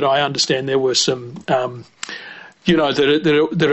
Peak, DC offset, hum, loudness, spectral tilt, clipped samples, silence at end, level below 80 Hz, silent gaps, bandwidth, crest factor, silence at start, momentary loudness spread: -4 dBFS; under 0.1%; none; -17 LUFS; -4 dB/octave; under 0.1%; 0 s; -54 dBFS; none; 8.4 kHz; 14 dB; 0 s; 15 LU